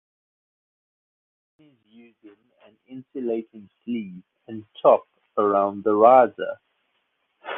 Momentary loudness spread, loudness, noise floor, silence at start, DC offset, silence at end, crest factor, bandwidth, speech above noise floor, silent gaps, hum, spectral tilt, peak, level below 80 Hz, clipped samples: 26 LU; -21 LUFS; -72 dBFS; 2.9 s; under 0.1%; 0 s; 22 dB; 3.9 kHz; 50 dB; none; none; -9 dB/octave; -2 dBFS; -72 dBFS; under 0.1%